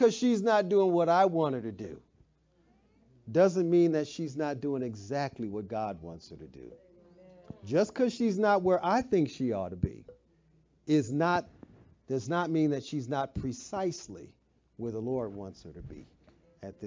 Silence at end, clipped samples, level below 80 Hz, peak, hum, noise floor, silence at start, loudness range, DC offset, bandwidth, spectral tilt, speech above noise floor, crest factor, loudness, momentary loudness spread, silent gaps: 0 s; under 0.1%; -58 dBFS; -12 dBFS; none; -68 dBFS; 0 s; 8 LU; under 0.1%; 7.6 kHz; -6.5 dB/octave; 38 dB; 18 dB; -30 LUFS; 22 LU; none